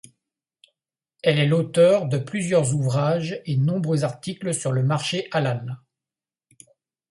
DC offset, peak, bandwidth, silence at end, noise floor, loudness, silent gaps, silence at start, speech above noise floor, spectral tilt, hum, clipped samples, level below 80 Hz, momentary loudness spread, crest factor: under 0.1%; -6 dBFS; 11.5 kHz; 1.35 s; under -90 dBFS; -22 LUFS; none; 1.25 s; over 69 dB; -6 dB/octave; none; under 0.1%; -64 dBFS; 10 LU; 16 dB